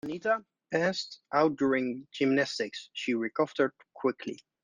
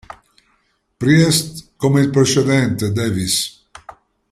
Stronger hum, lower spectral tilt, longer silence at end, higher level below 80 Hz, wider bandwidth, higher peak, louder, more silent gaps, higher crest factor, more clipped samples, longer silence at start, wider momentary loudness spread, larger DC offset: neither; about the same, -5 dB/octave vs -5 dB/octave; second, 0.25 s vs 0.4 s; second, -74 dBFS vs -50 dBFS; second, 9.6 kHz vs 15.5 kHz; second, -12 dBFS vs -2 dBFS; second, -30 LUFS vs -16 LUFS; neither; about the same, 20 dB vs 16 dB; neither; second, 0.05 s vs 1 s; about the same, 9 LU vs 8 LU; neither